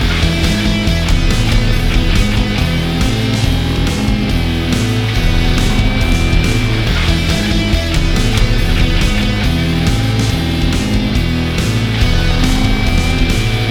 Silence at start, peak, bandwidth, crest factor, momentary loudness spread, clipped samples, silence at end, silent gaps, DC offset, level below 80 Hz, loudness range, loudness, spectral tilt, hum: 0 s; 0 dBFS; 17 kHz; 12 dB; 1 LU; under 0.1%; 0 s; none; under 0.1%; -16 dBFS; 1 LU; -14 LUFS; -5 dB/octave; none